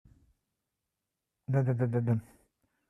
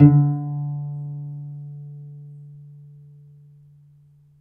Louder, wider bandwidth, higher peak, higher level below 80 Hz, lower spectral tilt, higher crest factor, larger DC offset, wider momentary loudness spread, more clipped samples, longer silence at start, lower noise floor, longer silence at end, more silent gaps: second, -31 LUFS vs -24 LUFS; about the same, 2.8 kHz vs 2.8 kHz; second, -18 dBFS vs 0 dBFS; second, -70 dBFS vs -58 dBFS; second, -11 dB/octave vs -13.5 dB/octave; second, 16 dB vs 22 dB; neither; second, 5 LU vs 24 LU; neither; first, 1.5 s vs 0 s; first, -87 dBFS vs -53 dBFS; second, 0.65 s vs 1.7 s; neither